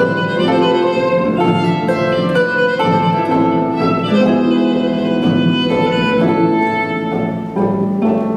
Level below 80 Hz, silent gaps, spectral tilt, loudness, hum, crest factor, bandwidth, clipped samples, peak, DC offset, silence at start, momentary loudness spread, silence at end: -48 dBFS; none; -7.5 dB/octave; -15 LUFS; none; 12 dB; 9.6 kHz; under 0.1%; -2 dBFS; under 0.1%; 0 s; 3 LU; 0 s